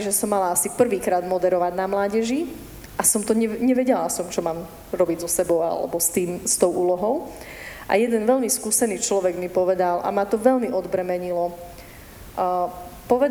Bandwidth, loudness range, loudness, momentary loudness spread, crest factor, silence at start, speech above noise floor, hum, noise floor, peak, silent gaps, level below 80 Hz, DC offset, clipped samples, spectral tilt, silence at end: over 20 kHz; 2 LU; -22 LUFS; 13 LU; 18 dB; 0 s; 20 dB; none; -42 dBFS; -4 dBFS; none; -50 dBFS; under 0.1%; under 0.1%; -4 dB/octave; 0 s